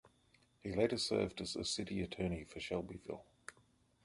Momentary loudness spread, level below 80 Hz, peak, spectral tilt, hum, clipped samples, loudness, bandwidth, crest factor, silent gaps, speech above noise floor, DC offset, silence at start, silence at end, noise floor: 15 LU; -60 dBFS; -20 dBFS; -4.5 dB/octave; none; under 0.1%; -40 LUFS; 11.5 kHz; 22 dB; none; 33 dB; under 0.1%; 0.65 s; 0.55 s; -72 dBFS